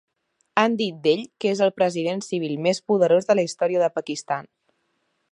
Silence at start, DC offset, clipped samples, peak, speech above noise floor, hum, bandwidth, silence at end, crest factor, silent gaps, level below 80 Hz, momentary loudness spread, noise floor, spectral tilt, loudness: 0.55 s; under 0.1%; under 0.1%; -2 dBFS; 50 dB; none; 10.5 kHz; 0.85 s; 20 dB; none; -76 dBFS; 9 LU; -72 dBFS; -5 dB/octave; -22 LUFS